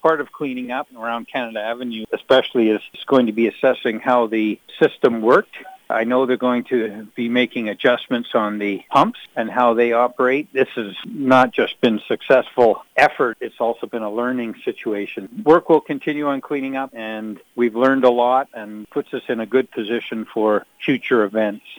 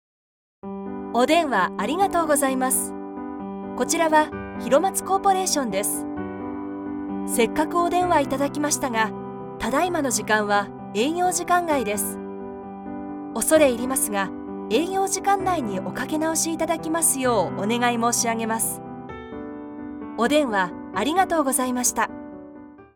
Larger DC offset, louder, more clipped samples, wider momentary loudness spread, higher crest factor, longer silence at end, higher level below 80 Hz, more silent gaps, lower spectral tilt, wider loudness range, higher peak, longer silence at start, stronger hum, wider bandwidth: neither; first, -19 LUFS vs -22 LUFS; neither; second, 11 LU vs 15 LU; about the same, 16 dB vs 20 dB; about the same, 0.05 s vs 0.1 s; second, -64 dBFS vs -54 dBFS; neither; first, -6.5 dB/octave vs -3 dB/octave; about the same, 3 LU vs 2 LU; about the same, -2 dBFS vs -4 dBFS; second, 0.05 s vs 0.65 s; neither; about the same, over 20 kHz vs 19.5 kHz